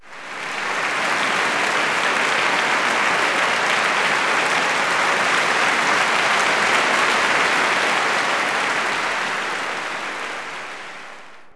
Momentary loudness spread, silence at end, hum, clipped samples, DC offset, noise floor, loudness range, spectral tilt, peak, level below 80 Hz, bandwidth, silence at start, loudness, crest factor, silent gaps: 11 LU; 0 s; none; under 0.1%; under 0.1%; -41 dBFS; 4 LU; -1 dB/octave; -4 dBFS; -64 dBFS; 11 kHz; 0 s; -18 LUFS; 16 dB; none